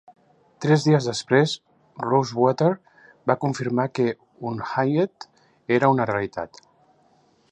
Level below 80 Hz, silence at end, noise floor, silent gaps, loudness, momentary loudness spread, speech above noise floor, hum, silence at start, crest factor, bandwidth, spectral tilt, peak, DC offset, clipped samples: -64 dBFS; 1.05 s; -61 dBFS; none; -23 LUFS; 13 LU; 39 dB; none; 0.6 s; 20 dB; 10 kHz; -6.5 dB/octave; -4 dBFS; under 0.1%; under 0.1%